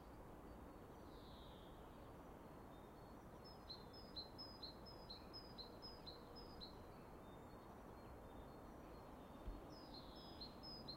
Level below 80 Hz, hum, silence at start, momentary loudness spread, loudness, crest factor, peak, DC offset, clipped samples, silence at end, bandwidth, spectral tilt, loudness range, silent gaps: -66 dBFS; none; 0 s; 6 LU; -58 LUFS; 18 dB; -40 dBFS; under 0.1%; under 0.1%; 0 s; 16 kHz; -5.5 dB/octave; 4 LU; none